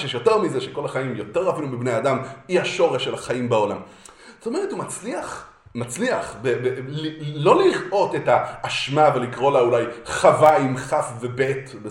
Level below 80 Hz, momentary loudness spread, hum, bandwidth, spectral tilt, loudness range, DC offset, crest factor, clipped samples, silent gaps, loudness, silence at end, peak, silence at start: -58 dBFS; 12 LU; none; 16 kHz; -5 dB/octave; 8 LU; under 0.1%; 20 dB; under 0.1%; none; -21 LUFS; 0 s; -2 dBFS; 0 s